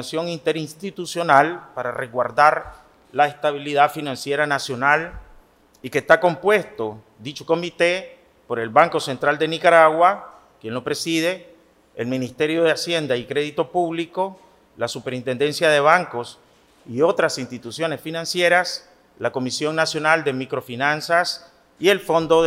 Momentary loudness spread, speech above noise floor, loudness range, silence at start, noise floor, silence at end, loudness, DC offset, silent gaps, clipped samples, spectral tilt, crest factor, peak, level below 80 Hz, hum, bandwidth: 14 LU; 31 dB; 4 LU; 0 s; -51 dBFS; 0 s; -20 LUFS; under 0.1%; none; under 0.1%; -4 dB/octave; 20 dB; 0 dBFS; -58 dBFS; none; 16 kHz